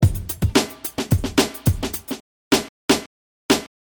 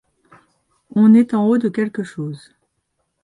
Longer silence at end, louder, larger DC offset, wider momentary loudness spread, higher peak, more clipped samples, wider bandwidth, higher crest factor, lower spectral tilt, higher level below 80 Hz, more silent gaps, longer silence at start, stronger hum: second, 0.15 s vs 0.85 s; second, -22 LUFS vs -16 LUFS; neither; second, 9 LU vs 17 LU; about the same, -4 dBFS vs -4 dBFS; neither; first, over 20 kHz vs 10.5 kHz; about the same, 18 dB vs 16 dB; second, -4.5 dB/octave vs -8.5 dB/octave; first, -34 dBFS vs -66 dBFS; first, 2.20-2.51 s, 2.69-2.88 s, 3.06-3.49 s vs none; second, 0 s vs 0.95 s; neither